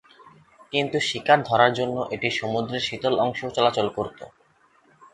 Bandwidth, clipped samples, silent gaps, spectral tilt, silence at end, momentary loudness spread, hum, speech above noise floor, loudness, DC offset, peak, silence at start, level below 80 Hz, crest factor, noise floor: 11.5 kHz; under 0.1%; none; -4.5 dB/octave; 0.85 s; 8 LU; none; 37 dB; -23 LUFS; under 0.1%; -2 dBFS; 0.25 s; -60 dBFS; 22 dB; -60 dBFS